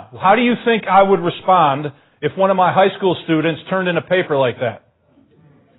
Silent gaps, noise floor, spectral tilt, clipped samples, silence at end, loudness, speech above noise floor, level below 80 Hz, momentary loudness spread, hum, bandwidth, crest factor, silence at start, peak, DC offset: none; -54 dBFS; -11 dB/octave; under 0.1%; 1 s; -16 LUFS; 39 dB; -58 dBFS; 11 LU; none; 4.1 kHz; 16 dB; 0 s; 0 dBFS; under 0.1%